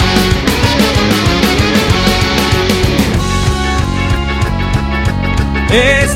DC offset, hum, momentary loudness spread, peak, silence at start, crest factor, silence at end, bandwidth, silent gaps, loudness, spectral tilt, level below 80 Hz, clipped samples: under 0.1%; none; 4 LU; 0 dBFS; 0 s; 12 dB; 0 s; 16.5 kHz; none; -12 LUFS; -5 dB/octave; -18 dBFS; under 0.1%